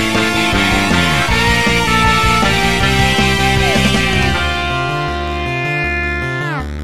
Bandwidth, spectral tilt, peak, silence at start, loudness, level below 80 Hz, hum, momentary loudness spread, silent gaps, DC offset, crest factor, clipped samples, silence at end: 16 kHz; -4 dB/octave; 0 dBFS; 0 s; -13 LUFS; -24 dBFS; none; 7 LU; none; 3%; 14 dB; under 0.1%; 0 s